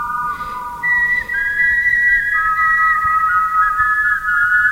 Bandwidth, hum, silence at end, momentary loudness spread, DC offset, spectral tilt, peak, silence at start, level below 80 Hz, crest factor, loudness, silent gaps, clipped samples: 16 kHz; none; 0 s; 9 LU; under 0.1%; -2.5 dB/octave; -4 dBFS; 0 s; -40 dBFS; 12 dB; -14 LUFS; none; under 0.1%